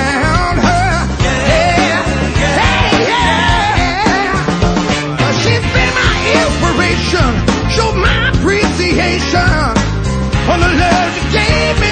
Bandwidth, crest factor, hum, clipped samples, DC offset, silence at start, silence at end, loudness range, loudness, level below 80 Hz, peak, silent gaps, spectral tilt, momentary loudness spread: 9.4 kHz; 12 dB; none; under 0.1%; under 0.1%; 0 s; 0 s; 1 LU; -12 LUFS; -20 dBFS; 0 dBFS; none; -5 dB/octave; 3 LU